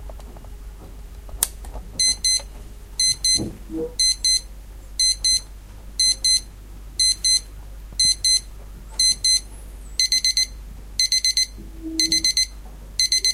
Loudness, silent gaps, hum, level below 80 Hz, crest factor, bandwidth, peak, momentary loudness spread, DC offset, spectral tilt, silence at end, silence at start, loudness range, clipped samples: -18 LUFS; none; none; -38 dBFS; 22 dB; 16 kHz; 0 dBFS; 15 LU; under 0.1%; 0.5 dB/octave; 0 s; 0 s; 2 LU; under 0.1%